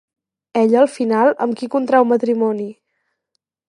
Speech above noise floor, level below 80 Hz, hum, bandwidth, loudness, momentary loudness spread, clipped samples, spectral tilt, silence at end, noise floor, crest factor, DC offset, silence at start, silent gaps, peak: 59 dB; -74 dBFS; none; 11.5 kHz; -17 LUFS; 9 LU; under 0.1%; -6.5 dB/octave; 0.95 s; -74 dBFS; 16 dB; under 0.1%; 0.55 s; none; -2 dBFS